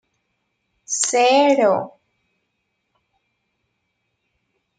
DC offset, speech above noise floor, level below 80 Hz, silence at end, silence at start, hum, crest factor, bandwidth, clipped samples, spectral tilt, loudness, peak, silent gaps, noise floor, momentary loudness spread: under 0.1%; 57 dB; -76 dBFS; 2.9 s; 0.9 s; none; 18 dB; 9.6 kHz; under 0.1%; -2 dB/octave; -17 LUFS; -4 dBFS; none; -73 dBFS; 11 LU